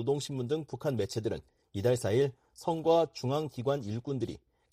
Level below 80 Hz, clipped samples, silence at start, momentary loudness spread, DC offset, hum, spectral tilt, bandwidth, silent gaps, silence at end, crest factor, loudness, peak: -64 dBFS; under 0.1%; 0 s; 11 LU; under 0.1%; none; -6.5 dB/octave; 15.5 kHz; none; 0.35 s; 18 dB; -32 LUFS; -14 dBFS